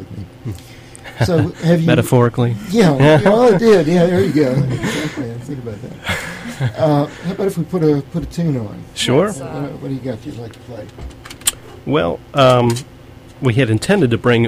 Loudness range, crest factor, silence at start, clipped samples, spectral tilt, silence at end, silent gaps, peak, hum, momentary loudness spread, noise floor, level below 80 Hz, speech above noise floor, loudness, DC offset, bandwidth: 9 LU; 16 dB; 0 s; under 0.1%; -6 dB/octave; 0 s; none; 0 dBFS; none; 19 LU; -37 dBFS; -42 dBFS; 22 dB; -15 LUFS; under 0.1%; 16 kHz